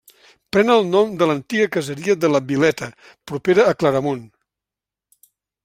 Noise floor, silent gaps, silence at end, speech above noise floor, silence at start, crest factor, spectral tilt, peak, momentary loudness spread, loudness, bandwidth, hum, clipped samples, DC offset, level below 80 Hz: -88 dBFS; none; 1.4 s; 70 dB; 0.55 s; 18 dB; -5.5 dB/octave; -2 dBFS; 11 LU; -18 LUFS; 15.5 kHz; none; under 0.1%; under 0.1%; -60 dBFS